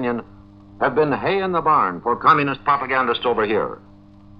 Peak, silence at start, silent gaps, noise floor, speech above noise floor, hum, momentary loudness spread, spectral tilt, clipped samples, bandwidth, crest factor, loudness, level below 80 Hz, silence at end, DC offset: -2 dBFS; 0 s; none; -45 dBFS; 26 dB; none; 9 LU; -8 dB/octave; under 0.1%; 6 kHz; 18 dB; -19 LUFS; -50 dBFS; 0.6 s; under 0.1%